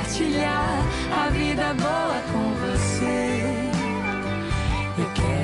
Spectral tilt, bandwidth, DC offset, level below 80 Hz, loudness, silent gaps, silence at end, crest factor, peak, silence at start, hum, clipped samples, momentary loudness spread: -5.5 dB/octave; 11.5 kHz; under 0.1%; -34 dBFS; -24 LUFS; none; 0 s; 10 dB; -14 dBFS; 0 s; none; under 0.1%; 3 LU